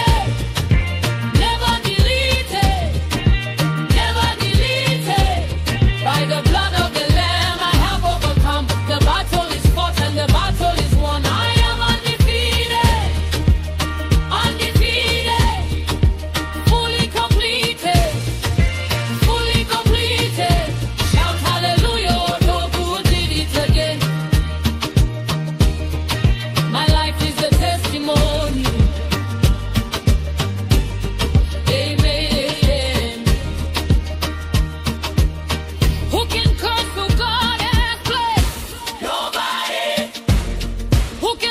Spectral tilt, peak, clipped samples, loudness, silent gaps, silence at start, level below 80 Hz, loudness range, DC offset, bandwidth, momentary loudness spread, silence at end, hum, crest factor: -5 dB/octave; -2 dBFS; under 0.1%; -18 LUFS; none; 0 s; -22 dBFS; 2 LU; under 0.1%; 16 kHz; 5 LU; 0 s; none; 14 dB